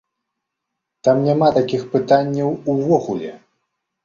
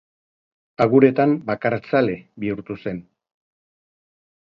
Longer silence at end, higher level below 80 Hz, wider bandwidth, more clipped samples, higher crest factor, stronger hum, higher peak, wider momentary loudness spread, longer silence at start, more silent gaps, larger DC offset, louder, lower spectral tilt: second, 0.7 s vs 1.5 s; about the same, -58 dBFS vs -60 dBFS; first, 7.4 kHz vs 5.8 kHz; neither; about the same, 18 dB vs 22 dB; neither; about the same, -2 dBFS vs 0 dBFS; second, 8 LU vs 15 LU; first, 1.05 s vs 0.8 s; neither; neither; about the same, -18 LUFS vs -20 LUFS; second, -7.5 dB/octave vs -9 dB/octave